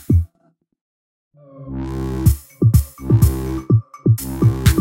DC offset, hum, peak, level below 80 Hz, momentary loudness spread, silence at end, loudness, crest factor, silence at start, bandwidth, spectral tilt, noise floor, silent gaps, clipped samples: under 0.1%; none; 0 dBFS; -26 dBFS; 11 LU; 0 s; -18 LUFS; 16 dB; 0.1 s; 16.5 kHz; -7 dB/octave; -62 dBFS; 0.81-1.31 s; under 0.1%